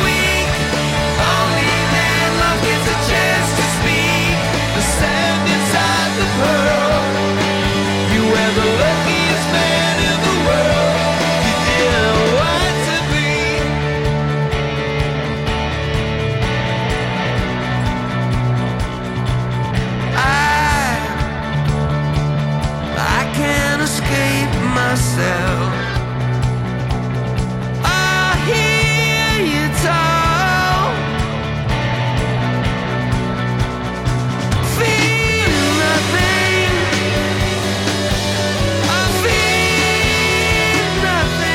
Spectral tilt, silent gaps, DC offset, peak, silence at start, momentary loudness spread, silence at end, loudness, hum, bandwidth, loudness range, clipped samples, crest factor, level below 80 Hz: -4.5 dB/octave; none; under 0.1%; -4 dBFS; 0 s; 6 LU; 0 s; -16 LUFS; none; 16.5 kHz; 4 LU; under 0.1%; 12 dB; -28 dBFS